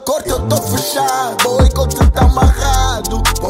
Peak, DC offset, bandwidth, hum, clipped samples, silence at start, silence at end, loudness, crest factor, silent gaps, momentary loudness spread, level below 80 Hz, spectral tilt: 0 dBFS; 0.2%; 16.5 kHz; none; under 0.1%; 0 s; 0 s; -14 LUFS; 12 dB; none; 5 LU; -16 dBFS; -4.5 dB/octave